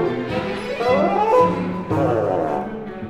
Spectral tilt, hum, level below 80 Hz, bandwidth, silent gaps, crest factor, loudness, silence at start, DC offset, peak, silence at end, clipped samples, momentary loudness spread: -7.5 dB/octave; none; -48 dBFS; 11.5 kHz; none; 16 dB; -20 LUFS; 0 s; 0.1%; -4 dBFS; 0 s; under 0.1%; 9 LU